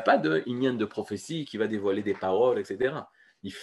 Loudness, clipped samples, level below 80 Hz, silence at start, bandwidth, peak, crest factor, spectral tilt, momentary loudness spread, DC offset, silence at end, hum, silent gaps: -28 LUFS; under 0.1%; -70 dBFS; 0 s; 12 kHz; -8 dBFS; 20 dB; -6 dB/octave; 11 LU; under 0.1%; 0 s; none; none